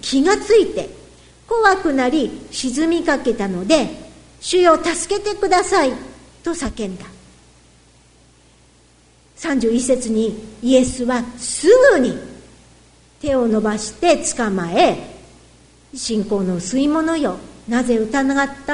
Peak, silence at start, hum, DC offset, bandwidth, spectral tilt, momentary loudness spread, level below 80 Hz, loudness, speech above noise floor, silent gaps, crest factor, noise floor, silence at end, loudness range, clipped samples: 0 dBFS; 0.05 s; 60 Hz at -50 dBFS; under 0.1%; 11 kHz; -4 dB/octave; 14 LU; -44 dBFS; -18 LUFS; 35 dB; none; 18 dB; -52 dBFS; 0 s; 7 LU; under 0.1%